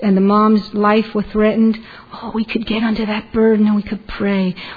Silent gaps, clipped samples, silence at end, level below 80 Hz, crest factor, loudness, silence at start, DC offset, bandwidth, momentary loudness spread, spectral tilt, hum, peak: none; under 0.1%; 0 s; -42 dBFS; 14 dB; -16 LUFS; 0 s; under 0.1%; 5 kHz; 12 LU; -9.5 dB/octave; none; -2 dBFS